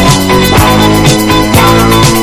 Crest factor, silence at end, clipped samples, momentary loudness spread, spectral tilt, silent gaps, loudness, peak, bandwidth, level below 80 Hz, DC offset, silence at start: 6 dB; 0 s; 4%; 1 LU; -4.5 dB/octave; none; -6 LUFS; 0 dBFS; 16 kHz; -18 dBFS; under 0.1%; 0 s